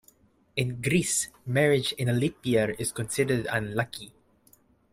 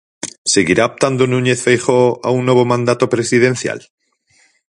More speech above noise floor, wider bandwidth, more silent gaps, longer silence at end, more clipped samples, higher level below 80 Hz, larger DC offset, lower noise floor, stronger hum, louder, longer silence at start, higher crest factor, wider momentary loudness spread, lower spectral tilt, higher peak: second, 35 dB vs 42 dB; first, 16 kHz vs 11.5 kHz; second, none vs 0.38-0.45 s; second, 0.85 s vs 1 s; neither; second, -58 dBFS vs -52 dBFS; neither; first, -62 dBFS vs -56 dBFS; neither; second, -27 LUFS vs -14 LUFS; first, 0.55 s vs 0.25 s; about the same, 20 dB vs 16 dB; about the same, 8 LU vs 9 LU; about the same, -4.5 dB/octave vs -4.5 dB/octave; second, -8 dBFS vs 0 dBFS